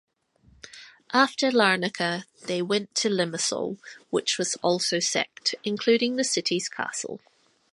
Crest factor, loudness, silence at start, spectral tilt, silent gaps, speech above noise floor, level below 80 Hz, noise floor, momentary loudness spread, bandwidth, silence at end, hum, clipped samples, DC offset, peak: 22 dB; -25 LUFS; 0.65 s; -2.5 dB/octave; none; 35 dB; -72 dBFS; -61 dBFS; 12 LU; 11.5 kHz; 0.55 s; none; under 0.1%; under 0.1%; -6 dBFS